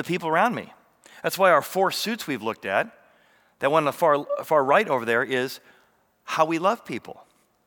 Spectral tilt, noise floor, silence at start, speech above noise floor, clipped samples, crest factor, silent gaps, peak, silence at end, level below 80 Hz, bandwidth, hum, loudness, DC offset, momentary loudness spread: -4.5 dB/octave; -63 dBFS; 0 s; 40 dB; under 0.1%; 20 dB; none; -4 dBFS; 0.55 s; -78 dBFS; over 20 kHz; none; -23 LUFS; under 0.1%; 12 LU